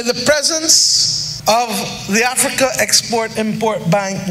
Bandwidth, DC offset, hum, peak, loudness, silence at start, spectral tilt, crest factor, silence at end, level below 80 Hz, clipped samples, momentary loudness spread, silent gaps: 16 kHz; under 0.1%; none; 0 dBFS; -14 LUFS; 0 s; -2 dB/octave; 16 dB; 0 s; -48 dBFS; under 0.1%; 9 LU; none